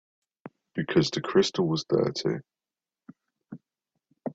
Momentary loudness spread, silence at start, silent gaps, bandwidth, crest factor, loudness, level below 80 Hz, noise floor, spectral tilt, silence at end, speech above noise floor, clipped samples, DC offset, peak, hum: 23 LU; 0.45 s; none; 8 kHz; 20 dB; -27 LUFS; -64 dBFS; under -90 dBFS; -5.5 dB/octave; 0 s; over 64 dB; under 0.1%; under 0.1%; -8 dBFS; none